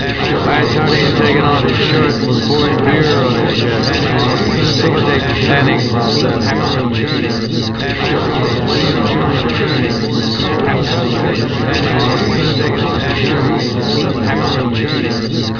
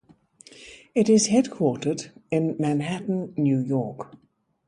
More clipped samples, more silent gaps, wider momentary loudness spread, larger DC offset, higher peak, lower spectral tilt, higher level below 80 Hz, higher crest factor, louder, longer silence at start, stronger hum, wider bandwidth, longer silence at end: neither; neither; second, 4 LU vs 22 LU; first, 0.3% vs under 0.1%; first, 0 dBFS vs -8 dBFS; about the same, -6 dB/octave vs -5.5 dB/octave; first, -34 dBFS vs -66 dBFS; about the same, 14 dB vs 18 dB; first, -14 LUFS vs -24 LUFS; second, 0 s vs 0.6 s; neither; second, 5.4 kHz vs 11.5 kHz; second, 0 s vs 0.6 s